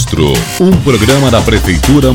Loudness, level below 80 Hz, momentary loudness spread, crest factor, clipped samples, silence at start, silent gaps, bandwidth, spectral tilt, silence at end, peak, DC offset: -9 LUFS; -18 dBFS; 3 LU; 8 dB; 0.5%; 0 s; none; 18 kHz; -5.5 dB/octave; 0 s; 0 dBFS; under 0.1%